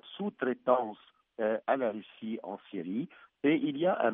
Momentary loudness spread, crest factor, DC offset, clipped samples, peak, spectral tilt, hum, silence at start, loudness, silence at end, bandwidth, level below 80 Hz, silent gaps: 12 LU; 20 dB; under 0.1%; under 0.1%; -12 dBFS; -4.5 dB/octave; none; 0.05 s; -33 LUFS; 0 s; 3.9 kHz; -84 dBFS; none